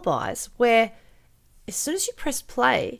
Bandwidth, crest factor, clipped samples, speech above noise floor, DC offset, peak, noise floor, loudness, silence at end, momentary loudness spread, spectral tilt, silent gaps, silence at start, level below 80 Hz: 16 kHz; 18 dB; under 0.1%; 32 dB; under 0.1%; -6 dBFS; -55 dBFS; -24 LUFS; 0.05 s; 11 LU; -2.5 dB/octave; none; 0 s; -52 dBFS